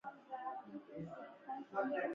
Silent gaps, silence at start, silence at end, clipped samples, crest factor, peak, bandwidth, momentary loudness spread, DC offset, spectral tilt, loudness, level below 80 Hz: none; 0.05 s; 0 s; under 0.1%; 18 dB; -26 dBFS; 7.4 kHz; 11 LU; under 0.1%; -5 dB/octave; -46 LUFS; -84 dBFS